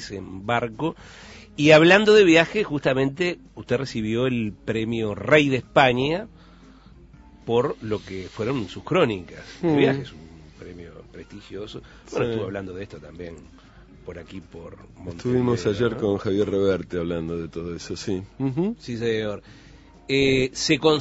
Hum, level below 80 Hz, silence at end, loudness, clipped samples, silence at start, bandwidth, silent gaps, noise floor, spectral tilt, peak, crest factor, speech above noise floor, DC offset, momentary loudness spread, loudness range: none; -50 dBFS; 0 s; -22 LUFS; under 0.1%; 0 s; 8 kHz; none; -48 dBFS; -5.5 dB/octave; -2 dBFS; 22 dB; 26 dB; under 0.1%; 22 LU; 14 LU